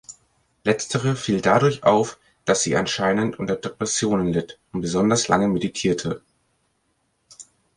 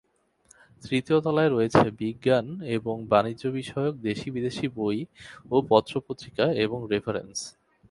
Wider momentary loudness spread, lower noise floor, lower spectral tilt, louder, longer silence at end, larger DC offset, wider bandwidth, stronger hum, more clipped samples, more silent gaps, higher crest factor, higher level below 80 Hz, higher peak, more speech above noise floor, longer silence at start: about the same, 10 LU vs 11 LU; first, -69 dBFS vs -61 dBFS; second, -4.5 dB/octave vs -6 dB/octave; first, -22 LUFS vs -26 LUFS; about the same, 0.35 s vs 0.4 s; neither; about the same, 11.5 kHz vs 11.5 kHz; neither; neither; neither; about the same, 20 dB vs 22 dB; about the same, -54 dBFS vs -56 dBFS; about the same, -2 dBFS vs -4 dBFS; first, 48 dB vs 36 dB; second, 0.1 s vs 0.85 s